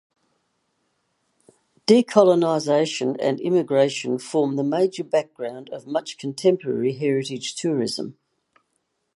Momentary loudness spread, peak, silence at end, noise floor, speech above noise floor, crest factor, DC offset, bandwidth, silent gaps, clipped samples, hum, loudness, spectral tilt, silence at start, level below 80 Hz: 14 LU; -2 dBFS; 1.05 s; -74 dBFS; 52 dB; 22 dB; under 0.1%; 11.5 kHz; none; under 0.1%; none; -22 LUFS; -5.5 dB/octave; 1.9 s; -74 dBFS